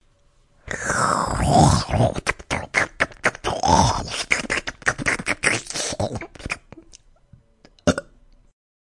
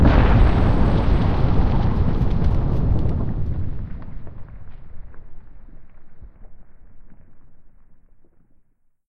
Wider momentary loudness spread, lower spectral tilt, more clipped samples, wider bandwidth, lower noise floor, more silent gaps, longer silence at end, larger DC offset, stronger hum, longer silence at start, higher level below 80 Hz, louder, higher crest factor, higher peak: second, 11 LU vs 23 LU; second, -4 dB/octave vs -9.5 dB/octave; neither; first, 11.5 kHz vs 5.8 kHz; about the same, -58 dBFS vs -58 dBFS; neither; second, 0.95 s vs 1.1 s; neither; neither; first, 0.65 s vs 0 s; second, -38 dBFS vs -24 dBFS; about the same, -21 LUFS vs -21 LUFS; about the same, 22 dB vs 20 dB; about the same, 0 dBFS vs 0 dBFS